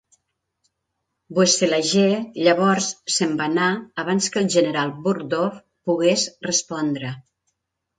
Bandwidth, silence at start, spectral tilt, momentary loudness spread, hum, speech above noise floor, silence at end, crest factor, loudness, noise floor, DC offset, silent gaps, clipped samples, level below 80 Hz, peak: 9.6 kHz; 1.3 s; -3.5 dB/octave; 9 LU; none; 57 dB; 0.8 s; 20 dB; -20 LUFS; -78 dBFS; under 0.1%; none; under 0.1%; -68 dBFS; -2 dBFS